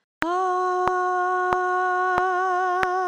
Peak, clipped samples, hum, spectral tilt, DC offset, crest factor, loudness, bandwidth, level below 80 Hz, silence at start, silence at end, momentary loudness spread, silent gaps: 0 dBFS; under 0.1%; none; -4.5 dB/octave; under 0.1%; 22 dB; -23 LUFS; 10.5 kHz; -54 dBFS; 0.2 s; 0 s; 1 LU; none